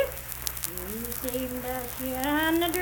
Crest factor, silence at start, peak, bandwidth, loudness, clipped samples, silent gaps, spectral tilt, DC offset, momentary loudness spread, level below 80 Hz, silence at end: 26 dB; 0 s; -4 dBFS; 19.5 kHz; -29 LUFS; under 0.1%; none; -3.5 dB/octave; under 0.1%; 8 LU; -46 dBFS; 0 s